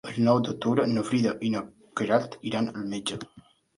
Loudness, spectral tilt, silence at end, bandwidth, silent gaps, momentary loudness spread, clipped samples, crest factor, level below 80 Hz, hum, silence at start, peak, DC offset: -27 LUFS; -6 dB/octave; 0.4 s; 11.5 kHz; none; 10 LU; under 0.1%; 20 dB; -66 dBFS; none; 0.05 s; -8 dBFS; under 0.1%